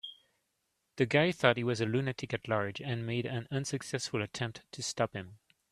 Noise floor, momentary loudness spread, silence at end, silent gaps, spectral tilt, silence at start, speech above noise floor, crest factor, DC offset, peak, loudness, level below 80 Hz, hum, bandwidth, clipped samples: -81 dBFS; 11 LU; 0.35 s; none; -5 dB/octave; 0.05 s; 48 dB; 26 dB; under 0.1%; -8 dBFS; -33 LUFS; -68 dBFS; none; 13.5 kHz; under 0.1%